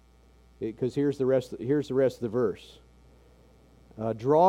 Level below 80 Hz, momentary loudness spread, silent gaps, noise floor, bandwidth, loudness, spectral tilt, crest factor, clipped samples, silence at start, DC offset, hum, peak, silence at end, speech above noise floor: -58 dBFS; 11 LU; none; -58 dBFS; 13 kHz; -29 LUFS; -8 dB/octave; 20 dB; under 0.1%; 0.6 s; under 0.1%; none; -8 dBFS; 0 s; 31 dB